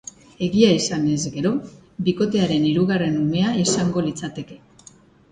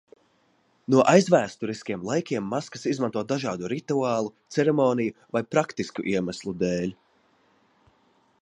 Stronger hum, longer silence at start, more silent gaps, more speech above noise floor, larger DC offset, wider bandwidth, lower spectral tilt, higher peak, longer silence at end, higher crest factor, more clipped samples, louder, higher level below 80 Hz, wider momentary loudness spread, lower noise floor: neither; second, 0.4 s vs 0.9 s; neither; second, 30 dB vs 41 dB; neither; second, 9.6 kHz vs 11 kHz; about the same, -5.5 dB/octave vs -6 dB/octave; about the same, -2 dBFS vs -4 dBFS; second, 0.75 s vs 1.5 s; about the same, 18 dB vs 22 dB; neither; first, -20 LUFS vs -25 LUFS; first, -52 dBFS vs -64 dBFS; first, 15 LU vs 12 LU; second, -50 dBFS vs -66 dBFS